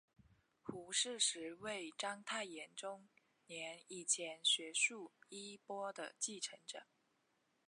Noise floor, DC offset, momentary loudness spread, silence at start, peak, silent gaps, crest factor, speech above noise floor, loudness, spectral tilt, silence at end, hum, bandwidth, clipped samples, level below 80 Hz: -81 dBFS; under 0.1%; 17 LU; 0.65 s; -24 dBFS; none; 22 dB; 38 dB; -41 LUFS; 0 dB/octave; 0.85 s; none; 11.5 kHz; under 0.1%; -86 dBFS